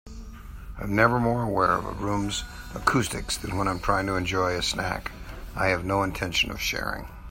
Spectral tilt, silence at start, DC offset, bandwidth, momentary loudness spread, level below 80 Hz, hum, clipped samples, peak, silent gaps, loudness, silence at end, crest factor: -4.5 dB/octave; 0.05 s; under 0.1%; 16.5 kHz; 15 LU; -40 dBFS; none; under 0.1%; -4 dBFS; none; -26 LUFS; 0 s; 22 dB